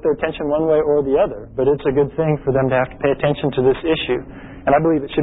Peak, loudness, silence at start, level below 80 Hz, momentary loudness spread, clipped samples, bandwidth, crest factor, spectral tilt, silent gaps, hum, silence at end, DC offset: -4 dBFS; -18 LUFS; 0.05 s; -42 dBFS; 5 LU; under 0.1%; 4 kHz; 14 dB; -12 dB/octave; none; none; 0 s; under 0.1%